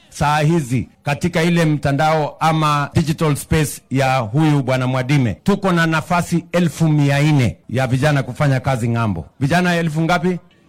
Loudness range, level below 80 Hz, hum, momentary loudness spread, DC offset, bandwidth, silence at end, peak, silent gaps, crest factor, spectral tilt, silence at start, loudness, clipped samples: 1 LU; -42 dBFS; none; 5 LU; under 0.1%; 16 kHz; 0.3 s; -2 dBFS; none; 14 dB; -6.5 dB/octave; 0.1 s; -17 LUFS; under 0.1%